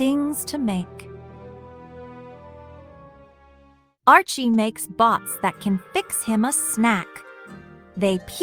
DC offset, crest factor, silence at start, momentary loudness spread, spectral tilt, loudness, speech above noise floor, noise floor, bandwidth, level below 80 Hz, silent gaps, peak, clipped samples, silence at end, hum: under 0.1%; 22 dB; 0 s; 25 LU; -4 dB/octave; -21 LUFS; 34 dB; -55 dBFS; over 20 kHz; -58 dBFS; none; -2 dBFS; under 0.1%; 0 s; none